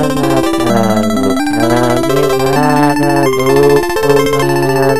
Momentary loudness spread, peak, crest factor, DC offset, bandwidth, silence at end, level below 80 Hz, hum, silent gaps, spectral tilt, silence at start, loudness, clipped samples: 3 LU; 0 dBFS; 12 dB; 6%; 14.5 kHz; 0 s; -34 dBFS; none; none; -5.5 dB/octave; 0 s; -11 LUFS; 0.1%